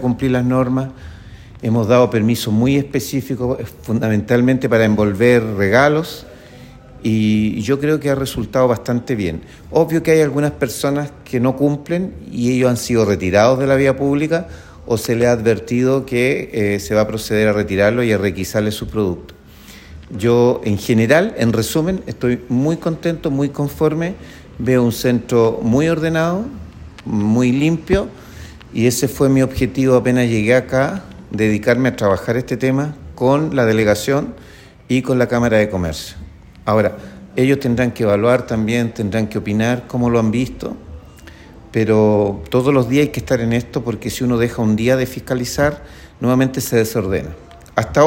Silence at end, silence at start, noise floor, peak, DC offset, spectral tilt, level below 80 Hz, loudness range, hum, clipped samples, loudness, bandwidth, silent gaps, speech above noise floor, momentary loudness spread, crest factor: 0 s; 0 s; -41 dBFS; 0 dBFS; under 0.1%; -6.5 dB/octave; -42 dBFS; 3 LU; none; under 0.1%; -17 LUFS; 16.5 kHz; none; 25 dB; 10 LU; 16 dB